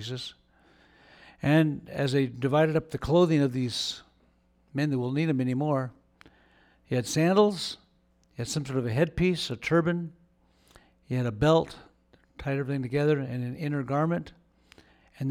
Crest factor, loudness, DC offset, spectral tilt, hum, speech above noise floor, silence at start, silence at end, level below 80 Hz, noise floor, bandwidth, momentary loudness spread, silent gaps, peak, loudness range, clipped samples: 20 dB; -27 LUFS; under 0.1%; -6 dB/octave; none; 39 dB; 0 s; 0 s; -54 dBFS; -66 dBFS; 15.5 kHz; 14 LU; none; -10 dBFS; 4 LU; under 0.1%